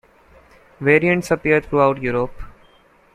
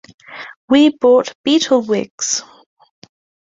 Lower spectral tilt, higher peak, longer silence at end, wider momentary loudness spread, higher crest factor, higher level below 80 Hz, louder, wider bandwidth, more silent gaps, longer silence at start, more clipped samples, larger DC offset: first, -7 dB/octave vs -3 dB/octave; about the same, -2 dBFS vs -2 dBFS; second, 0.65 s vs 1.05 s; second, 8 LU vs 21 LU; about the same, 18 dB vs 16 dB; first, -44 dBFS vs -60 dBFS; second, -18 LUFS vs -15 LUFS; first, 14 kHz vs 7.8 kHz; second, none vs 0.57-0.68 s, 1.35-1.44 s, 2.11-2.18 s; first, 0.8 s vs 0.3 s; neither; neither